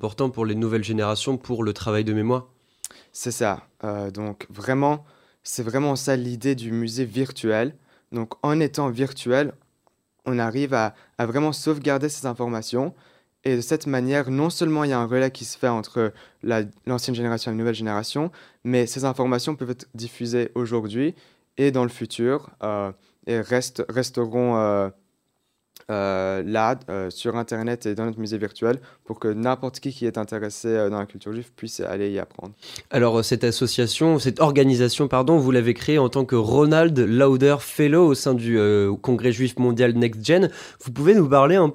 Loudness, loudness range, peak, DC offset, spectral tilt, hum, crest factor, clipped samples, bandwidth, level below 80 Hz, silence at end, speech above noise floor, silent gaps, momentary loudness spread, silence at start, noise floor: -23 LUFS; 8 LU; -2 dBFS; under 0.1%; -6 dB/octave; none; 20 dB; under 0.1%; 16 kHz; -60 dBFS; 0 s; 51 dB; none; 13 LU; 0 s; -73 dBFS